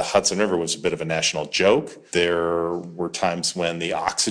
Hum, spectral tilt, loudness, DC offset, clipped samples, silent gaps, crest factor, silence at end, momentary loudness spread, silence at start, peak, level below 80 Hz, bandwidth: none; -3 dB/octave; -22 LUFS; under 0.1%; under 0.1%; none; 20 dB; 0 s; 6 LU; 0 s; -2 dBFS; -56 dBFS; 11 kHz